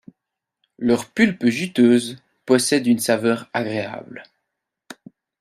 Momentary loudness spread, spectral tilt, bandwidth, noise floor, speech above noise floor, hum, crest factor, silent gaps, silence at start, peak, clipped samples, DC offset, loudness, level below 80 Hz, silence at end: 17 LU; -4.5 dB/octave; 14 kHz; -83 dBFS; 64 dB; none; 18 dB; none; 0.8 s; -4 dBFS; under 0.1%; under 0.1%; -19 LUFS; -64 dBFS; 0.45 s